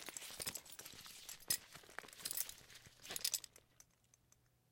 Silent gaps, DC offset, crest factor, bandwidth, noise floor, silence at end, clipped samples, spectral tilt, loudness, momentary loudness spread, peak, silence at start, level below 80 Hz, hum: none; under 0.1%; 28 dB; 17 kHz; -75 dBFS; 0.9 s; under 0.1%; 0.5 dB/octave; -44 LUFS; 17 LU; -20 dBFS; 0 s; -76 dBFS; none